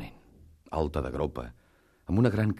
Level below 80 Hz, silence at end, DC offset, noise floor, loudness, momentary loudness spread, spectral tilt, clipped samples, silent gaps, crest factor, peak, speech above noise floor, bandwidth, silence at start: -44 dBFS; 0 s; under 0.1%; -56 dBFS; -30 LUFS; 21 LU; -8.5 dB/octave; under 0.1%; none; 20 dB; -10 dBFS; 28 dB; 12.5 kHz; 0 s